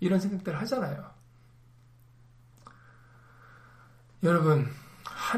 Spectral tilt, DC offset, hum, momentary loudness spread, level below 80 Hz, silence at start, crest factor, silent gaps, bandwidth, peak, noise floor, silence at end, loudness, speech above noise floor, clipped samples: -7 dB/octave; under 0.1%; none; 18 LU; -64 dBFS; 0 s; 20 dB; none; 15.5 kHz; -12 dBFS; -57 dBFS; 0 s; -29 LUFS; 30 dB; under 0.1%